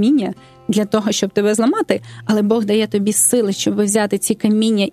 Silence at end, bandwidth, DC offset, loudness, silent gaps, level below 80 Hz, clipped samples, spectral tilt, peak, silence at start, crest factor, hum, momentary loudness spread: 0 s; 14.5 kHz; under 0.1%; -16 LUFS; none; -60 dBFS; under 0.1%; -4 dB/octave; 0 dBFS; 0 s; 16 dB; none; 7 LU